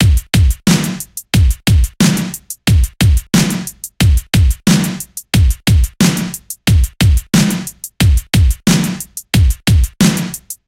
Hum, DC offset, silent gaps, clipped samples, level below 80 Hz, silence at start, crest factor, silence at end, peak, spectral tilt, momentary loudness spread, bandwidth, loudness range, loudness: none; under 0.1%; none; under 0.1%; -18 dBFS; 0 s; 12 dB; 0.15 s; 0 dBFS; -5 dB/octave; 9 LU; 17 kHz; 1 LU; -14 LUFS